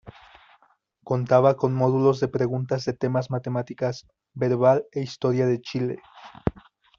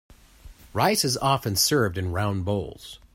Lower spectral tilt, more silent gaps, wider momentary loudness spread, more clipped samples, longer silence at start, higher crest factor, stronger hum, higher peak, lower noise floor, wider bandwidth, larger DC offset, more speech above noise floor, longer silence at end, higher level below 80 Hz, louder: first, -7 dB/octave vs -4 dB/octave; neither; about the same, 12 LU vs 12 LU; neither; second, 0.05 s vs 0.45 s; about the same, 20 dB vs 18 dB; neither; about the same, -4 dBFS vs -6 dBFS; first, -64 dBFS vs -48 dBFS; second, 7.2 kHz vs 16 kHz; neither; first, 40 dB vs 24 dB; first, 0.5 s vs 0.2 s; about the same, -52 dBFS vs -50 dBFS; about the same, -24 LUFS vs -24 LUFS